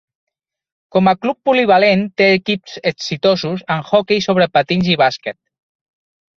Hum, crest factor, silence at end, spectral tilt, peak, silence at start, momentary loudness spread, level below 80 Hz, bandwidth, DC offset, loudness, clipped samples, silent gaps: none; 16 dB; 1.05 s; -6 dB/octave; 0 dBFS; 0.95 s; 9 LU; -56 dBFS; 7.2 kHz; under 0.1%; -15 LUFS; under 0.1%; none